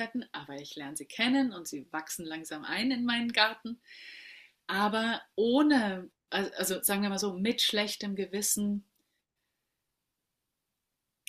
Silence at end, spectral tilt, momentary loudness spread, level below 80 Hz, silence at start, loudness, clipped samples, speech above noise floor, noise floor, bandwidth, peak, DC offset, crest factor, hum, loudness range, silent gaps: 2.5 s; -3 dB/octave; 16 LU; -74 dBFS; 0 s; -30 LUFS; under 0.1%; 54 dB; -85 dBFS; 15.5 kHz; -10 dBFS; under 0.1%; 22 dB; none; 4 LU; none